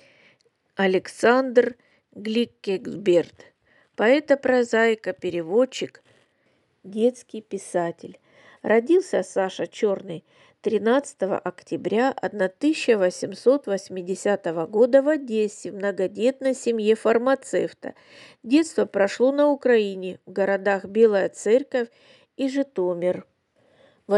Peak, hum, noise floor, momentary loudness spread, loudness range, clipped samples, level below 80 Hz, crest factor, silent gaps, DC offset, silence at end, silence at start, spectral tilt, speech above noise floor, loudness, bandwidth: -4 dBFS; none; -66 dBFS; 12 LU; 4 LU; under 0.1%; -76 dBFS; 20 dB; none; under 0.1%; 0 s; 0.8 s; -5 dB/octave; 44 dB; -23 LUFS; 11.5 kHz